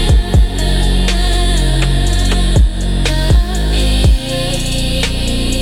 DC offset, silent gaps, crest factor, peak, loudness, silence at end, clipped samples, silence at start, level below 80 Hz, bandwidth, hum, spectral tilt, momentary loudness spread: under 0.1%; none; 10 dB; -2 dBFS; -14 LUFS; 0 s; under 0.1%; 0 s; -14 dBFS; 15 kHz; none; -4.5 dB/octave; 4 LU